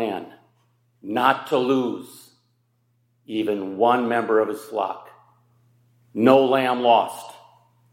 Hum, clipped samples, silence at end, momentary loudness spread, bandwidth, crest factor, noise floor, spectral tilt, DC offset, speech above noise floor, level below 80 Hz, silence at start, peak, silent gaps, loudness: none; under 0.1%; 0.55 s; 18 LU; 16.5 kHz; 22 dB; -67 dBFS; -5.5 dB/octave; under 0.1%; 46 dB; -78 dBFS; 0 s; -2 dBFS; none; -21 LUFS